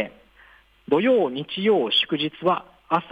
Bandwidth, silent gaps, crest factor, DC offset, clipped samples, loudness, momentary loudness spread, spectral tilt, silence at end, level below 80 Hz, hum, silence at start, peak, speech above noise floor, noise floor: 10 kHz; none; 16 dB; under 0.1%; under 0.1%; -22 LUFS; 7 LU; -6.5 dB/octave; 0.05 s; -64 dBFS; none; 0 s; -8 dBFS; 32 dB; -54 dBFS